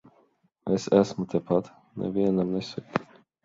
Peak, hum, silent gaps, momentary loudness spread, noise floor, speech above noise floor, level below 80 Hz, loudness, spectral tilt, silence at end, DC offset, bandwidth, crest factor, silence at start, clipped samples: -6 dBFS; none; none; 11 LU; -66 dBFS; 40 dB; -60 dBFS; -27 LUFS; -7 dB/octave; 0.4 s; under 0.1%; 7.8 kHz; 22 dB; 0.65 s; under 0.1%